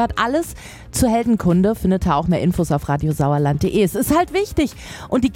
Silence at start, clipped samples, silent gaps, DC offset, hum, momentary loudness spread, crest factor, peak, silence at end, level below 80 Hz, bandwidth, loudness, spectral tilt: 0 s; under 0.1%; none; under 0.1%; none; 6 LU; 14 dB; -4 dBFS; 0 s; -34 dBFS; 17 kHz; -18 LUFS; -6.5 dB/octave